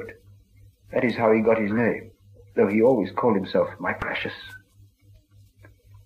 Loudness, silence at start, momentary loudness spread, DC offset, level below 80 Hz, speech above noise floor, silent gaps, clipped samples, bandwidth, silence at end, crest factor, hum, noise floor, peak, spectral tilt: -23 LUFS; 0 s; 14 LU; under 0.1%; -56 dBFS; 33 dB; none; under 0.1%; 8.8 kHz; 1.5 s; 18 dB; none; -55 dBFS; -6 dBFS; -8 dB/octave